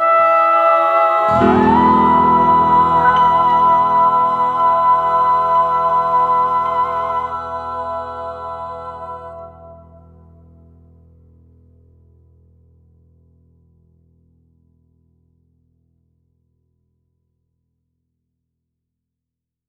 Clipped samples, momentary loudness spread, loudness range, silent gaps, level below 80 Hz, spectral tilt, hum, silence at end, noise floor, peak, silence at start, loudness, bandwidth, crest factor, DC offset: under 0.1%; 16 LU; 19 LU; none; -46 dBFS; -7.5 dB/octave; none; 9.95 s; -83 dBFS; 0 dBFS; 0 s; -14 LUFS; 7.8 kHz; 16 dB; under 0.1%